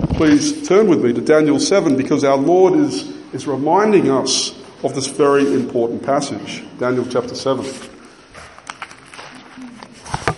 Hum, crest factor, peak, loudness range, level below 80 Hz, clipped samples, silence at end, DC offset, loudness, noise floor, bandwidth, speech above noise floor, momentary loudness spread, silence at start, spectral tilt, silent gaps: none; 16 dB; 0 dBFS; 10 LU; -42 dBFS; under 0.1%; 0 s; under 0.1%; -16 LUFS; -40 dBFS; 11.5 kHz; 25 dB; 21 LU; 0 s; -5 dB/octave; none